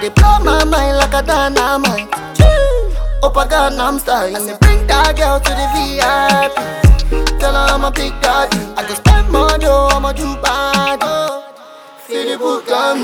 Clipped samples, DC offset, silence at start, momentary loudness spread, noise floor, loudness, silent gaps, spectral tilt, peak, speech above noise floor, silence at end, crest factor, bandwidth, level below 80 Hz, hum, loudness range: 0.2%; under 0.1%; 0 s; 7 LU; -36 dBFS; -13 LUFS; none; -4.5 dB/octave; 0 dBFS; 24 dB; 0 s; 12 dB; 18 kHz; -16 dBFS; none; 1 LU